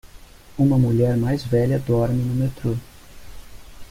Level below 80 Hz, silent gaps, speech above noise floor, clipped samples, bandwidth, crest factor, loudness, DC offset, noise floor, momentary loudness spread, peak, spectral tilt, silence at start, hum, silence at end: -40 dBFS; none; 24 dB; under 0.1%; 15.5 kHz; 14 dB; -21 LUFS; under 0.1%; -44 dBFS; 9 LU; -6 dBFS; -8.5 dB/octave; 0.15 s; none; 0.05 s